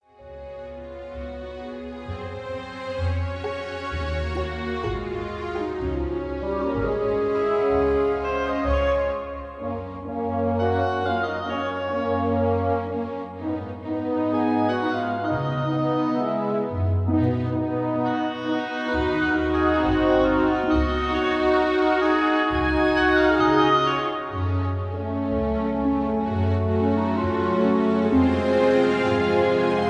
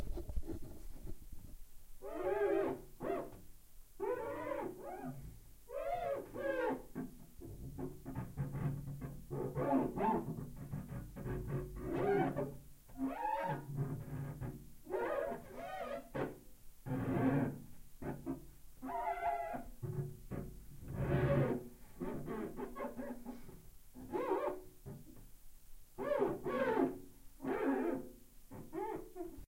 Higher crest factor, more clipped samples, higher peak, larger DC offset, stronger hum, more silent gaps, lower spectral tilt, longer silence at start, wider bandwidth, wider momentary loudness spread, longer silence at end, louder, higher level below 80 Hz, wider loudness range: about the same, 16 dB vs 18 dB; neither; first, -6 dBFS vs -22 dBFS; neither; neither; neither; about the same, -7.5 dB/octave vs -8 dB/octave; first, 0.2 s vs 0 s; second, 9 kHz vs 16 kHz; second, 12 LU vs 19 LU; about the same, 0 s vs 0 s; first, -23 LUFS vs -41 LUFS; first, -38 dBFS vs -54 dBFS; first, 8 LU vs 5 LU